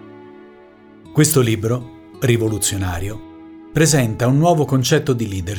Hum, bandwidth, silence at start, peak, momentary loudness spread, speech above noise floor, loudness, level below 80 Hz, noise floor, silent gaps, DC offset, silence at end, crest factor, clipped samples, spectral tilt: none; over 20 kHz; 0.05 s; -2 dBFS; 10 LU; 28 dB; -17 LUFS; -42 dBFS; -44 dBFS; none; under 0.1%; 0 s; 16 dB; under 0.1%; -5 dB/octave